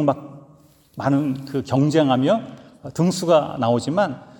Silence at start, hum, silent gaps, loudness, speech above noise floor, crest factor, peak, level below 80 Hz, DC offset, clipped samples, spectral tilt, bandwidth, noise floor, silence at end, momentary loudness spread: 0 s; none; none; -20 LUFS; 32 dB; 16 dB; -4 dBFS; -62 dBFS; under 0.1%; under 0.1%; -6.5 dB/octave; 18 kHz; -52 dBFS; 0.1 s; 14 LU